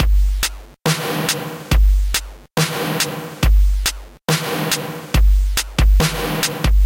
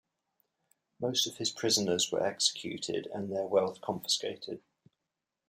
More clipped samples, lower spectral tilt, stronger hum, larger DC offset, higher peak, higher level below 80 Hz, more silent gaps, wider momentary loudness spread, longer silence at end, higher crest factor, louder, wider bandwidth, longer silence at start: neither; first, -4 dB/octave vs -2.5 dB/octave; neither; neither; first, -2 dBFS vs -12 dBFS; first, -18 dBFS vs -78 dBFS; neither; second, 6 LU vs 10 LU; second, 0 s vs 0.9 s; second, 14 dB vs 22 dB; first, -19 LUFS vs -31 LUFS; about the same, 17 kHz vs 16 kHz; second, 0 s vs 1 s